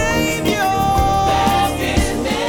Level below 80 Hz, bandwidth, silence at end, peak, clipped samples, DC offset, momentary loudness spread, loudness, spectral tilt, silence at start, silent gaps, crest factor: -28 dBFS; 19.5 kHz; 0 s; -2 dBFS; under 0.1%; under 0.1%; 3 LU; -16 LUFS; -4.5 dB/octave; 0 s; none; 14 dB